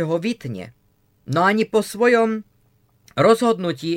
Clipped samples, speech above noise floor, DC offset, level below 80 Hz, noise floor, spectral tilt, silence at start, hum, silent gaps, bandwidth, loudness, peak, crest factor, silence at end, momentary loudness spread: under 0.1%; 41 dB; under 0.1%; -62 dBFS; -60 dBFS; -5.5 dB/octave; 0 s; none; none; 16.5 kHz; -19 LUFS; -4 dBFS; 18 dB; 0 s; 15 LU